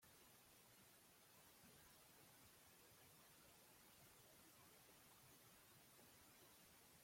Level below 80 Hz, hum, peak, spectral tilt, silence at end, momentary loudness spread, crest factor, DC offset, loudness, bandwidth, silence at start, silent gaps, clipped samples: -88 dBFS; none; -56 dBFS; -2.5 dB/octave; 0 s; 1 LU; 14 dB; under 0.1%; -68 LUFS; 16.5 kHz; 0 s; none; under 0.1%